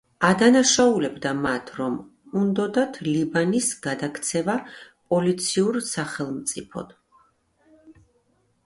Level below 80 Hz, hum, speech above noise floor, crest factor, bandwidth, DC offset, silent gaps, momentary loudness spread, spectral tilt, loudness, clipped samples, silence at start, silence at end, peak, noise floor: -60 dBFS; none; 43 dB; 22 dB; 11.5 kHz; under 0.1%; none; 13 LU; -4 dB/octave; -23 LUFS; under 0.1%; 0.2 s; 0.75 s; -2 dBFS; -66 dBFS